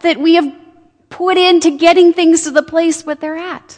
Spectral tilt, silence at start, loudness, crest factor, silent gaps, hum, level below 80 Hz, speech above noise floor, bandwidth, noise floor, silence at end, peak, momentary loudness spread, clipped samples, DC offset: -2 dB/octave; 0.05 s; -11 LUFS; 12 dB; none; none; -56 dBFS; 34 dB; 10 kHz; -46 dBFS; 0.05 s; 0 dBFS; 13 LU; under 0.1%; under 0.1%